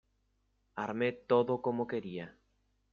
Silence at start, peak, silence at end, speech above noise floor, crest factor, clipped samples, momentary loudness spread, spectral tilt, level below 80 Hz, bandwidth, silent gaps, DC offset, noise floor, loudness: 0.75 s; -14 dBFS; 0.6 s; 43 dB; 22 dB; under 0.1%; 16 LU; -8 dB/octave; -72 dBFS; 6.8 kHz; none; under 0.1%; -76 dBFS; -34 LUFS